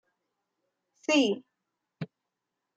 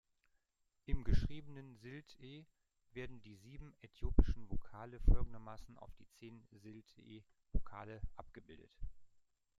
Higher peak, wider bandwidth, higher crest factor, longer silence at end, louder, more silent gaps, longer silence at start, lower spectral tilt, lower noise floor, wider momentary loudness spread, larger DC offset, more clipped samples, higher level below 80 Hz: about the same, -12 dBFS vs -14 dBFS; first, 9 kHz vs 6.6 kHz; about the same, 22 dB vs 26 dB; first, 0.75 s vs 0.55 s; first, -28 LUFS vs -44 LUFS; neither; first, 1.1 s vs 0.9 s; second, -4 dB/octave vs -8 dB/octave; about the same, -85 dBFS vs -83 dBFS; second, 18 LU vs 21 LU; neither; neither; second, -82 dBFS vs -42 dBFS